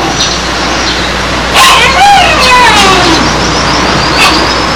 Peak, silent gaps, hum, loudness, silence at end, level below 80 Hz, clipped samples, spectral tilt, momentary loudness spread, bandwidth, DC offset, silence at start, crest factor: 0 dBFS; none; none; -5 LUFS; 0 s; -22 dBFS; 6%; -2.5 dB/octave; 7 LU; over 20 kHz; 2%; 0 s; 6 dB